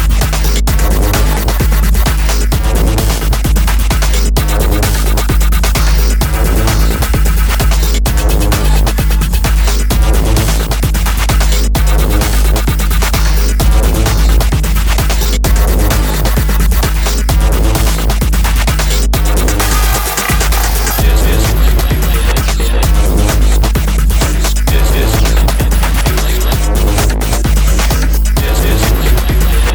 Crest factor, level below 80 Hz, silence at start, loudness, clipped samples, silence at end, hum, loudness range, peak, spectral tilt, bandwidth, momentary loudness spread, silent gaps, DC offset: 10 dB; -10 dBFS; 0 s; -12 LUFS; under 0.1%; 0 s; none; 1 LU; 0 dBFS; -4.5 dB/octave; 19.5 kHz; 2 LU; none; under 0.1%